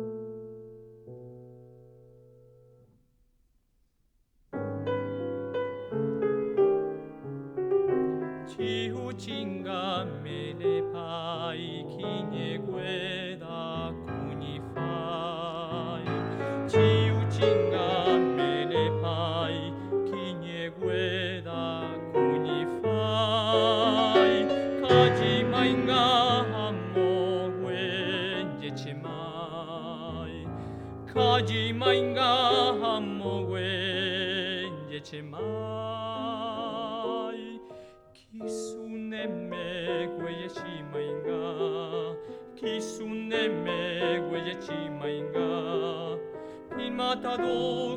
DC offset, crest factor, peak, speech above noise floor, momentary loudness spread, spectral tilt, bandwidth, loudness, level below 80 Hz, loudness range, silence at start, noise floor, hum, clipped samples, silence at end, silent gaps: under 0.1%; 20 dB; -8 dBFS; 38 dB; 14 LU; -6 dB/octave; 10.5 kHz; -29 LUFS; -60 dBFS; 11 LU; 0 s; -70 dBFS; none; under 0.1%; 0 s; none